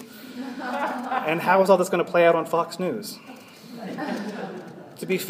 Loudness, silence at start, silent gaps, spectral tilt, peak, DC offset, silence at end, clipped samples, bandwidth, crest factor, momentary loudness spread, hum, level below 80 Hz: -23 LUFS; 0 s; none; -5 dB/octave; -2 dBFS; under 0.1%; 0 s; under 0.1%; 15.5 kHz; 22 dB; 21 LU; none; -80 dBFS